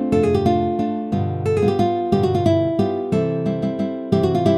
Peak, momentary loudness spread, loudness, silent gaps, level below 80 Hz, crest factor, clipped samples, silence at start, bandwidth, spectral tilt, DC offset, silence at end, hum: -4 dBFS; 5 LU; -20 LUFS; none; -50 dBFS; 16 dB; under 0.1%; 0 s; 12 kHz; -8.5 dB/octave; under 0.1%; 0 s; none